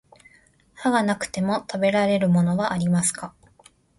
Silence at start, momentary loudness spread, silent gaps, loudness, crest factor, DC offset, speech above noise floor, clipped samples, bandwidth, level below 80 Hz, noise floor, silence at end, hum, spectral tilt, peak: 0.8 s; 6 LU; none; -22 LUFS; 16 dB; under 0.1%; 36 dB; under 0.1%; 11.5 kHz; -58 dBFS; -58 dBFS; 0.7 s; none; -5.5 dB/octave; -6 dBFS